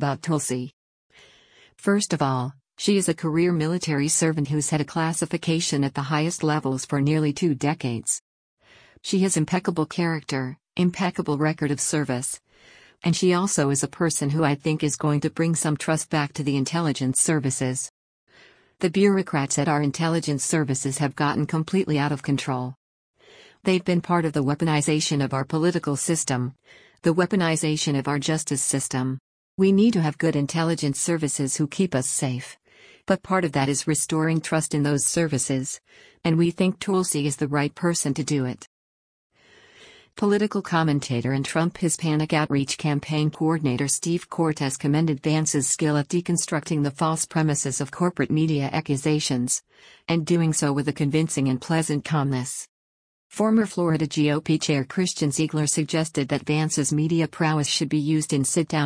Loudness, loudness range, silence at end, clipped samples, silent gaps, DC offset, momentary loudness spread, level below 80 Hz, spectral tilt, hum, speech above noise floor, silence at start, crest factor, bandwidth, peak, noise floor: -23 LUFS; 2 LU; 0 s; under 0.1%; 0.73-1.10 s, 8.21-8.57 s, 17.90-18.27 s, 22.77-23.14 s, 29.20-29.58 s, 38.67-39.30 s, 52.69-53.30 s; under 0.1%; 5 LU; -60 dBFS; -5 dB/octave; none; 32 dB; 0 s; 16 dB; 10.5 kHz; -8 dBFS; -55 dBFS